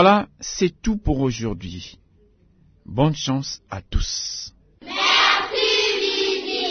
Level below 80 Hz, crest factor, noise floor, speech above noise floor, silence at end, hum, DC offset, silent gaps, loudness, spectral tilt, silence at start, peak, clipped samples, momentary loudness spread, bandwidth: -34 dBFS; 20 dB; -56 dBFS; 35 dB; 0 s; none; under 0.1%; none; -21 LUFS; -4 dB/octave; 0 s; -2 dBFS; under 0.1%; 16 LU; 6.6 kHz